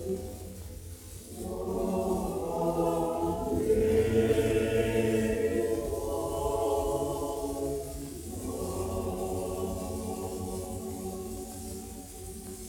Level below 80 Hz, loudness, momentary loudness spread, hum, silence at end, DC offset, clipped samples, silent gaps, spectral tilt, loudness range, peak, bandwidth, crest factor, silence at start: -46 dBFS; -31 LUFS; 15 LU; none; 0 s; under 0.1%; under 0.1%; none; -6 dB/octave; 8 LU; -14 dBFS; 18 kHz; 16 dB; 0 s